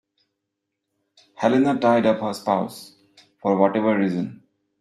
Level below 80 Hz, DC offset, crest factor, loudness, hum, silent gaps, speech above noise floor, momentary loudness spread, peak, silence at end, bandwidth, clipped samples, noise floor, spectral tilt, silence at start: -68 dBFS; under 0.1%; 20 dB; -21 LUFS; none; none; 60 dB; 11 LU; -4 dBFS; 0.45 s; 14 kHz; under 0.1%; -80 dBFS; -7 dB/octave; 1.4 s